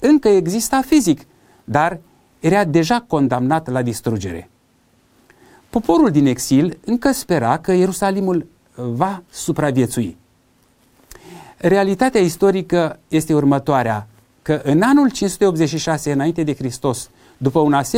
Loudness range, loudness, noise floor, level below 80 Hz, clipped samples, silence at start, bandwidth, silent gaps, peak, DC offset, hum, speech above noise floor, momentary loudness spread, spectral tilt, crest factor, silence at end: 4 LU; -17 LUFS; -57 dBFS; -46 dBFS; under 0.1%; 0 s; 16.5 kHz; none; -2 dBFS; under 0.1%; none; 41 dB; 9 LU; -6 dB/octave; 16 dB; 0 s